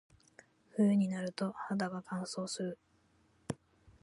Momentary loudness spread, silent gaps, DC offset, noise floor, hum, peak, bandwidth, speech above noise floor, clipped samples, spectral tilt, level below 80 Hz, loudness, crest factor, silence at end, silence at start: 16 LU; none; under 0.1%; -71 dBFS; none; -20 dBFS; 11.5 kHz; 36 dB; under 0.1%; -6 dB/octave; -74 dBFS; -36 LUFS; 18 dB; 0.5 s; 0.75 s